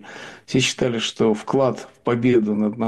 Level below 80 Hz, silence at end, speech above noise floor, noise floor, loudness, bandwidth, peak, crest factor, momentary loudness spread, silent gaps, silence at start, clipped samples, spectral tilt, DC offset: -56 dBFS; 0 s; 19 dB; -39 dBFS; -20 LUFS; 12.5 kHz; -8 dBFS; 14 dB; 8 LU; none; 0.05 s; under 0.1%; -5 dB/octave; under 0.1%